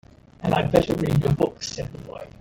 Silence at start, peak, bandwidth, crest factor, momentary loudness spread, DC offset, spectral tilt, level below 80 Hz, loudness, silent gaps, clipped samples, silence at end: 0.4 s; -4 dBFS; 17 kHz; 20 dB; 15 LU; under 0.1%; -6.5 dB/octave; -44 dBFS; -23 LUFS; none; under 0.1%; 0.1 s